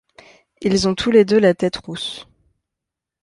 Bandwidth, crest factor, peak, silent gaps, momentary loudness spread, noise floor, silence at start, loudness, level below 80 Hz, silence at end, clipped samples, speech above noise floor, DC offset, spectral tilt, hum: 11.5 kHz; 18 dB; -2 dBFS; none; 14 LU; -84 dBFS; 0.6 s; -18 LUFS; -48 dBFS; 1 s; under 0.1%; 67 dB; under 0.1%; -5 dB/octave; none